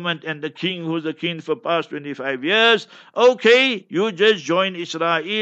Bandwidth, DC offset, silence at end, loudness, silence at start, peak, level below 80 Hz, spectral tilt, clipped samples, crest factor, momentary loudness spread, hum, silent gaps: 8.2 kHz; under 0.1%; 0 s; -19 LUFS; 0 s; -2 dBFS; -76 dBFS; -4 dB/octave; under 0.1%; 18 dB; 12 LU; none; none